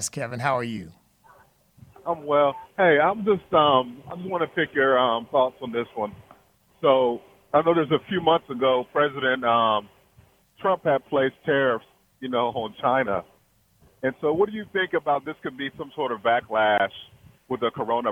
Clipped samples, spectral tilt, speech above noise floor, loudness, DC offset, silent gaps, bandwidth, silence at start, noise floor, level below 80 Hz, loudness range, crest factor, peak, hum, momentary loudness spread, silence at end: under 0.1%; -4.5 dB/octave; 39 dB; -24 LUFS; under 0.1%; none; 15.5 kHz; 0 s; -62 dBFS; -62 dBFS; 5 LU; 20 dB; -4 dBFS; none; 12 LU; 0 s